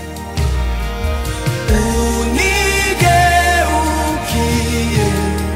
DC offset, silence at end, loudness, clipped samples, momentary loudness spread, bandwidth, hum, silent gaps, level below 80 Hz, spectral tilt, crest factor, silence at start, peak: under 0.1%; 0 s; -15 LUFS; under 0.1%; 9 LU; 16.5 kHz; none; none; -20 dBFS; -4.5 dB/octave; 14 dB; 0 s; -2 dBFS